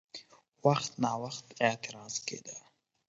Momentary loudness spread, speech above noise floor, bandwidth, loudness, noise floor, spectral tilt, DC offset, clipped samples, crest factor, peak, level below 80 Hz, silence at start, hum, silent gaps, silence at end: 18 LU; 20 dB; 8 kHz; -33 LUFS; -53 dBFS; -4 dB/octave; under 0.1%; under 0.1%; 24 dB; -10 dBFS; -76 dBFS; 0.15 s; none; none; 0.5 s